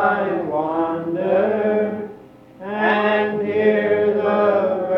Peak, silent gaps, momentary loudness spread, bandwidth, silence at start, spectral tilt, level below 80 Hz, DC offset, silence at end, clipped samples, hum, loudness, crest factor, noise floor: -4 dBFS; none; 7 LU; 5.6 kHz; 0 s; -8 dB/octave; -64 dBFS; under 0.1%; 0 s; under 0.1%; none; -19 LUFS; 16 dB; -42 dBFS